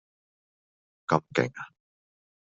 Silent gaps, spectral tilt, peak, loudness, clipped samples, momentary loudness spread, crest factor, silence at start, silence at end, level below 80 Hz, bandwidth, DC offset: none; -5 dB/octave; -4 dBFS; -28 LUFS; under 0.1%; 17 LU; 28 dB; 1.1 s; 0.85 s; -72 dBFS; 7.6 kHz; under 0.1%